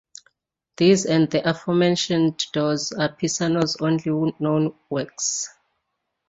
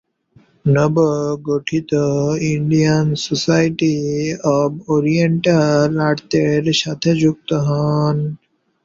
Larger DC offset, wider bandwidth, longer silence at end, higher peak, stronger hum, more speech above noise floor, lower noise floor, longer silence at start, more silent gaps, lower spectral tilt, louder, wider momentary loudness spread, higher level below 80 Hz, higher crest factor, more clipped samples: neither; about the same, 8 kHz vs 7.6 kHz; first, 0.8 s vs 0.5 s; about the same, -4 dBFS vs -2 dBFS; neither; first, 56 dB vs 37 dB; first, -77 dBFS vs -53 dBFS; first, 0.8 s vs 0.65 s; neither; second, -4.5 dB/octave vs -6 dB/octave; second, -22 LUFS vs -17 LUFS; about the same, 7 LU vs 5 LU; second, -62 dBFS vs -52 dBFS; about the same, 18 dB vs 14 dB; neither